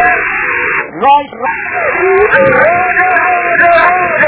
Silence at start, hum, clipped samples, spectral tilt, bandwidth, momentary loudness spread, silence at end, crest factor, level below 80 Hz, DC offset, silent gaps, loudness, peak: 0 s; none; 0.5%; -8 dB/octave; 4 kHz; 7 LU; 0 s; 10 dB; -42 dBFS; under 0.1%; none; -9 LUFS; 0 dBFS